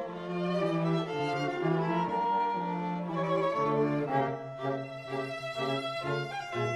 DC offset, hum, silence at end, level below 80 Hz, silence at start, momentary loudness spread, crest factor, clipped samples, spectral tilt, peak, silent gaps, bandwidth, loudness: under 0.1%; none; 0 s; -68 dBFS; 0 s; 7 LU; 16 dB; under 0.1%; -7 dB/octave; -16 dBFS; none; 11.5 kHz; -31 LUFS